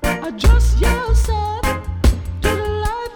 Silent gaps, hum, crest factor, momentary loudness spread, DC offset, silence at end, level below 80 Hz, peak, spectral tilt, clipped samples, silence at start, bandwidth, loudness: none; none; 14 dB; 7 LU; under 0.1%; 0 s; -18 dBFS; -2 dBFS; -5.5 dB/octave; under 0.1%; 0 s; 19.5 kHz; -18 LUFS